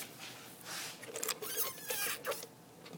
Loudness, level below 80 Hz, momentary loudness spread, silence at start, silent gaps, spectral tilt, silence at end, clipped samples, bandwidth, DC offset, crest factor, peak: -39 LUFS; -80 dBFS; 13 LU; 0 s; none; -0.5 dB/octave; 0 s; under 0.1%; 19.5 kHz; under 0.1%; 26 dB; -16 dBFS